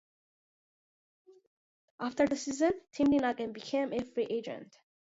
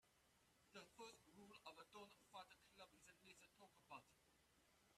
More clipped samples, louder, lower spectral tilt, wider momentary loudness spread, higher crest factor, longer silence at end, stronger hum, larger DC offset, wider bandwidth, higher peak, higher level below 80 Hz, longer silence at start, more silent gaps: neither; first, -32 LUFS vs -65 LUFS; first, -4.5 dB/octave vs -2.5 dB/octave; first, 11 LU vs 6 LU; about the same, 18 dB vs 22 dB; first, 0.45 s vs 0 s; neither; neither; second, 8 kHz vs 14 kHz; first, -16 dBFS vs -46 dBFS; first, -68 dBFS vs under -90 dBFS; first, 2 s vs 0 s; neither